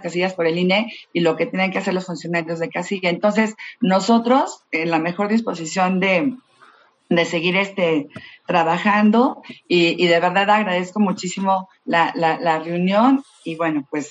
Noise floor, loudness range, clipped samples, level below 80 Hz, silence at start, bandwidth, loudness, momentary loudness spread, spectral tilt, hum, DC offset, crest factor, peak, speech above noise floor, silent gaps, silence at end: -52 dBFS; 3 LU; under 0.1%; -70 dBFS; 0 s; 8.4 kHz; -19 LUFS; 8 LU; -5.5 dB/octave; none; under 0.1%; 16 dB; -2 dBFS; 33 dB; none; 0 s